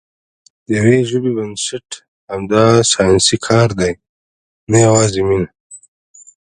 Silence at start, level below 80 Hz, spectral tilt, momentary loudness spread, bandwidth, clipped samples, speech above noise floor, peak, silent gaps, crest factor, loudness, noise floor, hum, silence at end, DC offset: 0.7 s; -42 dBFS; -4.5 dB/octave; 16 LU; 10.5 kHz; under 0.1%; over 77 dB; 0 dBFS; 2.08-2.27 s, 4.09-4.67 s, 5.60-5.70 s; 16 dB; -13 LUFS; under -90 dBFS; none; 0.7 s; under 0.1%